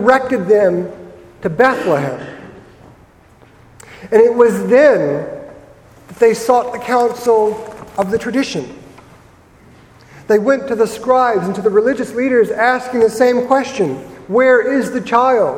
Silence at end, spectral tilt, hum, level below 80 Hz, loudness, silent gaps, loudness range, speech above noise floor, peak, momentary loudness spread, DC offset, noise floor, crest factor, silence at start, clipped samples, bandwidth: 0 s; -5.5 dB/octave; none; -52 dBFS; -14 LUFS; none; 6 LU; 32 dB; 0 dBFS; 14 LU; under 0.1%; -46 dBFS; 14 dB; 0 s; under 0.1%; 15.5 kHz